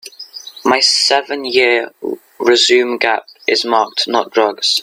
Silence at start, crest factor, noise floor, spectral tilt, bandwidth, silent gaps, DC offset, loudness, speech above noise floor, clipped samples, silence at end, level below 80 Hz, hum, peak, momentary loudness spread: 0.05 s; 14 dB; -34 dBFS; -1 dB/octave; 16 kHz; none; under 0.1%; -13 LUFS; 20 dB; under 0.1%; 0 s; -64 dBFS; none; 0 dBFS; 15 LU